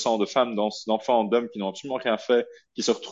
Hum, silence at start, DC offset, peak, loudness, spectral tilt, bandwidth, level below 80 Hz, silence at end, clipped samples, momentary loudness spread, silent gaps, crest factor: none; 0 s; under 0.1%; -8 dBFS; -25 LUFS; -4 dB/octave; 7.8 kHz; -76 dBFS; 0 s; under 0.1%; 8 LU; none; 18 dB